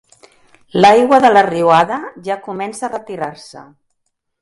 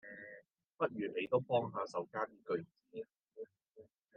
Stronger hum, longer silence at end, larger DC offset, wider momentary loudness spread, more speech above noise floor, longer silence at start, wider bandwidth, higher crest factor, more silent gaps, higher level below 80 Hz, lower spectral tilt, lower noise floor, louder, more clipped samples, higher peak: neither; first, 0.8 s vs 0.35 s; neither; about the same, 16 LU vs 18 LU; first, 56 dB vs 25 dB; first, 0.75 s vs 0.05 s; first, 11.5 kHz vs 7.4 kHz; second, 16 dB vs 22 dB; neither; first, -58 dBFS vs -86 dBFS; about the same, -5 dB/octave vs -5 dB/octave; first, -70 dBFS vs -64 dBFS; first, -13 LUFS vs -39 LUFS; neither; first, 0 dBFS vs -20 dBFS